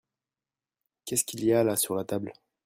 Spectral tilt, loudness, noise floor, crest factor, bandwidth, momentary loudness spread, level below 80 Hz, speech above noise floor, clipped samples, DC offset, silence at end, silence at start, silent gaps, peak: -4 dB/octave; -27 LUFS; under -90 dBFS; 18 dB; 16 kHz; 14 LU; -68 dBFS; over 63 dB; under 0.1%; under 0.1%; 0.35 s; 1.05 s; none; -12 dBFS